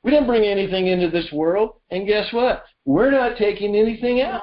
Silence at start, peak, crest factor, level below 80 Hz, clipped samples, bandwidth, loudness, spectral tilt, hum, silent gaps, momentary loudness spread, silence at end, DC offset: 0.05 s; -6 dBFS; 14 dB; -44 dBFS; under 0.1%; 5.6 kHz; -19 LUFS; -10.5 dB/octave; none; none; 5 LU; 0 s; under 0.1%